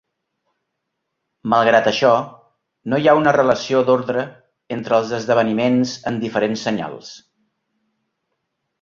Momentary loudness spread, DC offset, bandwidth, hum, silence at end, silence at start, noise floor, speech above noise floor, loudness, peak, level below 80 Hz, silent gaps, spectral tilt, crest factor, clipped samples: 17 LU; under 0.1%; 7.6 kHz; none; 1.65 s; 1.45 s; -77 dBFS; 59 dB; -17 LUFS; -2 dBFS; -60 dBFS; none; -5.5 dB/octave; 18 dB; under 0.1%